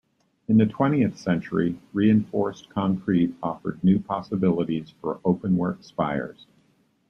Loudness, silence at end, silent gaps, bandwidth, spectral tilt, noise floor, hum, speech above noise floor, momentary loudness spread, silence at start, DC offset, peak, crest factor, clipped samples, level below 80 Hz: -24 LUFS; 0.8 s; none; 6.6 kHz; -9 dB/octave; -64 dBFS; none; 41 dB; 9 LU; 0.5 s; under 0.1%; -8 dBFS; 16 dB; under 0.1%; -58 dBFS